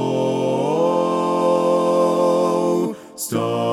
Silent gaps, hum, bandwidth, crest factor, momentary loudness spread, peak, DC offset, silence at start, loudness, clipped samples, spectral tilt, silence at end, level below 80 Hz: none; none; 16.5 kHz; 12 dB; 6 LU; -6 dBFS; under 0.1%; 0 s; -19 LUFS; under 0.1%; -6 dB/octave; 0 s; -70 dBFS